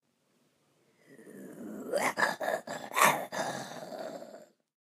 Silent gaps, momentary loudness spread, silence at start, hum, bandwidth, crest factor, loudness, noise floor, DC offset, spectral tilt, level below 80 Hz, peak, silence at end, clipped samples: none; 22 LU; 1.1 s; none; 15.5 kHz; 26 dB; -31 LUFS; -73 dBFS; under 0.1%; -2 dB/octave; -88 dBFS; -8 dBFS; 0.4 s; under 0.1%